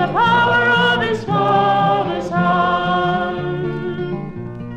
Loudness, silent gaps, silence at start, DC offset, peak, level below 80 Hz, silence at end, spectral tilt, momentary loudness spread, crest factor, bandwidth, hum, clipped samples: -17 LUFS; none; 0 s; under 0.1%; -4 dBFS; -46 dBFS; 0 s; -6.5 dB/octave; 11 LU; 14 dB; 9.2 kHz; none; under 0.1%